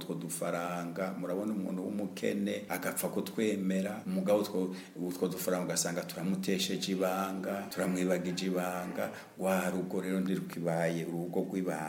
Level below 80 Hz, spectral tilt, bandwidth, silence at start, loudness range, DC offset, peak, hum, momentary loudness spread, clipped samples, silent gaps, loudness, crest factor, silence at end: -78 dBFS; -5 dB/octave; 17 kHz; 0 s; 2 LU; under 0.1%; -16 dBFS; none; 6 LU; under 0.1%; none; -34 LUFS; 18 dB; 0 s